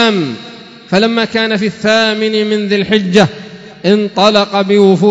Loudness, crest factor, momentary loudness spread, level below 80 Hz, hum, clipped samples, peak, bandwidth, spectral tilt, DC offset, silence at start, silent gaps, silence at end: -12 LUFS; 12 dB; 10 LU; -52 dBFS; none; 0.3%; 0 dBFS; 8 kHz; -5.5 dB/octave; under 0.1%; 0 s; none; 0 s